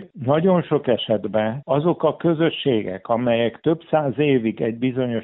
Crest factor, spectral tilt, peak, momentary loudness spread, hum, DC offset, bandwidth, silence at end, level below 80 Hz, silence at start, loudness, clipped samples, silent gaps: 16 dB; -5.5 dB/octave; -4 dBFS; 5 LU; none; under 0.1%; 4.1 kHz; 0 s; -60 dBFS; 0 s; -21 LUFS; under 0.1%; none